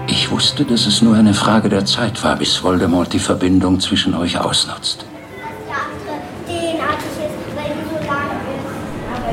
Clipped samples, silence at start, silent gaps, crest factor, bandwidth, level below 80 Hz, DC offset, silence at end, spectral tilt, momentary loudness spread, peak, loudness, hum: under 0.1%; 0 s; none; 16 dB; 15.5 kHz; -44 dBFS; under 0.1%; 0 s; -4.5 dB/octave; 14 LU; 0 dBFS; -16 LUFS; none